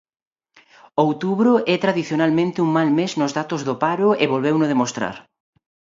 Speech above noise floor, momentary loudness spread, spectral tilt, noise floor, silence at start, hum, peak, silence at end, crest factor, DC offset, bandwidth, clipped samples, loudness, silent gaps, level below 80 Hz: 35 dB; 7 LU; -6 dB/octave; -54 dBFS; 0.95 s; none; -2 dBFS; 0.75 s; 18 dB; under 0.1%; 7.8 kHz; under 0.1%; -19 LUFS; none; -66 dBFS